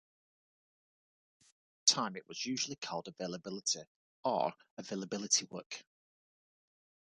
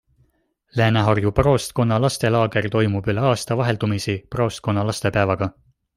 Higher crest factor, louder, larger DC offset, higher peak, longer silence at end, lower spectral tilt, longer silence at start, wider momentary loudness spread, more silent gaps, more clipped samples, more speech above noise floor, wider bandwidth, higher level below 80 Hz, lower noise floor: first, 28 dB vs 18 dB; second, -35 LUFS vs -20 LUFS; neither; second, -12 dBFS vs -2 dBFS; first, 1.3 s vs 0.45 s; second, -1.5 dB/octave vs -6 dB/octave; first, 1.85 s vs 0.75 s; first, 15 LU vs 6 LU; first, 3.87-4.23 s, 4.71-4.77 s, 5.66-5.70 s vs none; neither; first, over 52 dB vs 45 dB; second, 10.5 kHz vs 14 kHz; second, -84 dBFS vs -42 dBFS; first, under -90 dBFS vs -65 dBFS